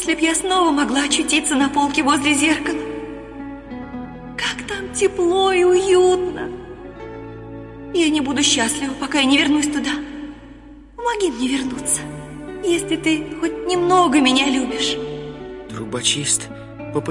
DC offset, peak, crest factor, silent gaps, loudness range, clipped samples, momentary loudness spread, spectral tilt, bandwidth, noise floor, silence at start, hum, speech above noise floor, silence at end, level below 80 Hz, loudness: under 0.1%; -4 dBFS; 16 dB; none; 4 LU; under 0.1%; 19 LU; -2.5 dB/octave; 11.5 kHz; -41 dBFS; 0 s; none; 23 dB; 0 s; -46 dBFS; -18 LUFS